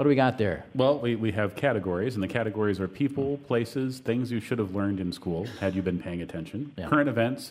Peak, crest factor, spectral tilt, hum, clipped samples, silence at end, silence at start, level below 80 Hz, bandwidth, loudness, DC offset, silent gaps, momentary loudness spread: -8 dBFS; 18 dB; -7 dB/octave; none; under 0.1%; 0 s; 0 s; -58 dBFS; 15 kHz; -28 LUFS; under 0.1%; none; 8 LU